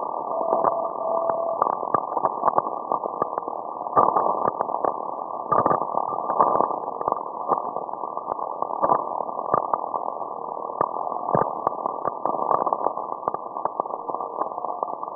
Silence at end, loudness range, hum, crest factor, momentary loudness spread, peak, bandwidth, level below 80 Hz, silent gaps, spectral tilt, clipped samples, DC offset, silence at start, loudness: 0 s; 3 LU; none; 22 dB; 9 LU; -2 dBFS; 2 kHz; -64 dBFS; none; -13 dB/octave; under 0.1%; under 0.1%; 0 s; -25 LUFS